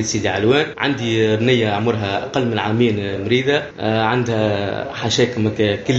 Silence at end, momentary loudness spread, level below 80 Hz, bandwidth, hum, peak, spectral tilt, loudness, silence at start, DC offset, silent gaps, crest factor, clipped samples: 0 s; 5 LU; -50 dBFS; 8 kHz; none; -2 dBFS; -5 dB/octave; -18 LUFS; 0 s; under 0.1%; none; 16 dB; under 0.1%